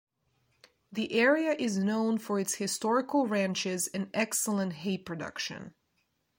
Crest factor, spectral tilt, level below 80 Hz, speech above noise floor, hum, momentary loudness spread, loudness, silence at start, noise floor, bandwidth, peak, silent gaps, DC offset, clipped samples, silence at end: 18 dB; -4 dB/octave; -74 dBFS; 46 dB; none; 11 LU; -30 LUFS; 0.9 s; -76 dBFS; 16.5 kHz; -14 dBFS; none; under 0.1%; under 0.1%; 0.7 s